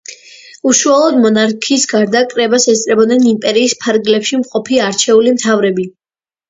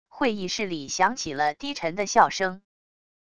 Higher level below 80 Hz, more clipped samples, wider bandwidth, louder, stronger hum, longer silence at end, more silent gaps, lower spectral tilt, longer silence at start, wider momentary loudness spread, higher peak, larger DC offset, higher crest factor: about the same, -58 dBFS vs -60 dBFS; neither; second, 8 kHz vs 11 kHz; first, -11 LUFS vs -25 LUFS; neither; about the same, 0.6 s vs 0.7 s; neither; about the same, -3 dB/octave vs -3 dB/octave; about the same, 0.1 s vs 0.05 s; second, 6 LU vs 9 LU; first, 0 dBFS vs -4 dBFS; second, under 0.1% vs 0.4%; second, 12 dB vs 22 dB